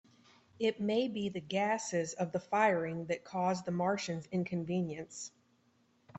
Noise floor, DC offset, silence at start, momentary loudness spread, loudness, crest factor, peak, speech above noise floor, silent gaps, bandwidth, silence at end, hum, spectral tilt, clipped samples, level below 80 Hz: -71 dBFS; under 0.1%; 0.6 s; 8 LU; -35 LUFS; 20 dB; -16 dBFS; 37 dB; none; 8.4 kHz; 0 s; none; -5 dB/octave; under 0.1%; -74 dBFS